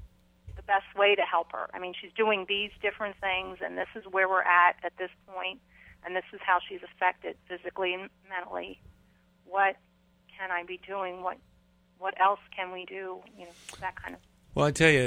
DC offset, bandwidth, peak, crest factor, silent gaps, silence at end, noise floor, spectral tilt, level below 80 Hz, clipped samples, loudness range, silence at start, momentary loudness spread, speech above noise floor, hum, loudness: under 0.1%; 15.5 kHz; -8 dBFS; 22 dB; none; 0 s; -64 dBFS; -4.5 dB/octave; -58 dBFS; under 0.1%; 6 LU; 0 s; 18 LU; 34 dB; none; -29 LUFS